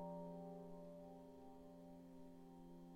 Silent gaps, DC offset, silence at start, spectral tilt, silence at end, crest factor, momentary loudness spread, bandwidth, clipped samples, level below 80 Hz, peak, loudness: none; under 0.1%; 0 s; -8.5 dB/octave; 0 s; 14 dB; 8 LU; 16.5 kHz; under 0.1%; -74 dBFS; -42 dBFS; -58 LUFS